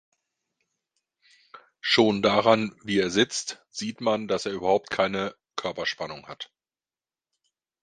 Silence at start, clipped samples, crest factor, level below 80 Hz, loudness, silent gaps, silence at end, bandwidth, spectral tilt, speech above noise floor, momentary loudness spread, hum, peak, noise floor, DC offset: 1.55 s; under 0.1%; 22 dB; -64 dBFS; -25 LUFS; none; 1.4 s; 10 kHz; -4 dB/octave; over 65 dB; 14 LU; none; -4 dBFS; under -90 dBFS; under 0.1%